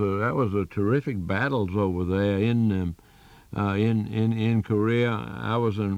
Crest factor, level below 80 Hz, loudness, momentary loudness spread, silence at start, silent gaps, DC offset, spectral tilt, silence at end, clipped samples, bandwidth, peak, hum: 14 dB; -56 dBFS; -25 LUFS; 6 LU; 0 s; none; under 0.1%; -8.5 dB/octave; 0 s; under 0.1%; 8.4 kHz; -12 dBFS; none